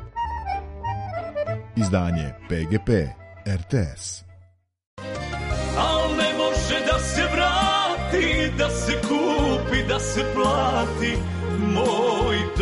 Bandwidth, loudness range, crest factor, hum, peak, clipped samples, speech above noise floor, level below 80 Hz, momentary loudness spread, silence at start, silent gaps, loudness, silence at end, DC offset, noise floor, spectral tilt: 11.5 kHz; 6 LU; 16 dB; none; -6 dBFS; under 0.1%; 32 dB; -34 dBFS; 10 LU; 0 s; 4.87-4.97 s; -23 LUFS; 0 s; under 0.1%; -55 dBFS; -5 dB/octave